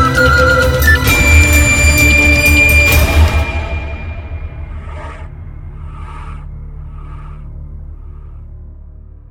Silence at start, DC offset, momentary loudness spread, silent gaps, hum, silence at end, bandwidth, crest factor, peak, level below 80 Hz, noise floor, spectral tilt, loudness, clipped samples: 0 s; under 0.1%; 24 LU; none; none; 0.3 s; 18 kHz; 12 dB; 0 dBFS; -18 dBFS; -33 dBFS; -4 dB/octave; -9 LUFS; under 0.1%